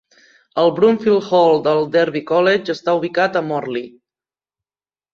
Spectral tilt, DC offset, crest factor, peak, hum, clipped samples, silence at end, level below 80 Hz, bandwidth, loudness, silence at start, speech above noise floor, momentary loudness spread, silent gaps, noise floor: -6.5 dB/octave; under 0.1%; 14 dB; -2 dBFS; none; under 0.1%; 1.25 s; -64 dBFS; 7.4 kHz; -16 LUFS; 0.55 s; over 74 dB; 9 LU; none; under -90 dBFS